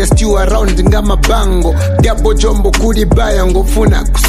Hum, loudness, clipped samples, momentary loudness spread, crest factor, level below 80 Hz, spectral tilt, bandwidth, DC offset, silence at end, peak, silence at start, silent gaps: none; -11 LUFS; under 0.1%; 1 LU; 8 dB; -12 dBFS; -5.5 dB/octave; 15 kHz; under 0.1%; 0 s; 0 dBFS; 0 s; none